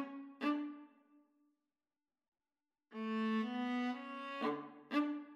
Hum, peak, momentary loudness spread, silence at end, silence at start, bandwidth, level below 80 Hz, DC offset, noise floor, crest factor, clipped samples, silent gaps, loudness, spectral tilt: none; -22 dBFS; 10 LU; 0 s; 0 s; 7.8 kHz; under -90 dBFS; under 0.1%; under -90 dBFS; 20 dB; under 0.1%; 2.28-2.32 s; -40 LUFS; -6 dB/octave